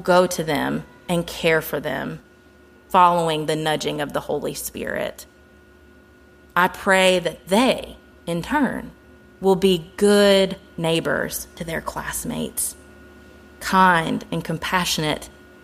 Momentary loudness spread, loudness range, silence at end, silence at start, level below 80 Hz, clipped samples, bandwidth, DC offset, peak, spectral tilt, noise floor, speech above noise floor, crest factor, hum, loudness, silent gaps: 13 LU; 5 LU; 0.35 s; 0 s; -48 dBFS; under 0.1%; 15.5 kHz; under 0.1%; -2 dBFS; -4 dB/octave; -50 dBFS; 30 dB; 20 dB; none; -21 LUFS; none